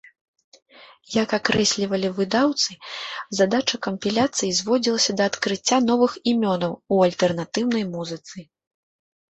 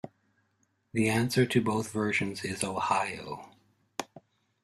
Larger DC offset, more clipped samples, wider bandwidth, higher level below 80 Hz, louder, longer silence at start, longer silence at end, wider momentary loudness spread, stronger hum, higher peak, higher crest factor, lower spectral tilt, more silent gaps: neither; neither; second, 8.2 kHz vs 14.5 kHz; about the same, -62 dBFS vs -64 dBFS; first, -22 LUFS vs -29 LUFS; first, 0.8 s vs 0.05 s; first, 0.95 s vs 0.45 s; second, 11 LU vs 16 LU; neither; first, -4 dBFS vs -10 dBFS; about the same, 18 dB vs 22 dB; second, -3.5 dB/octave vs -5 dB/octave; neither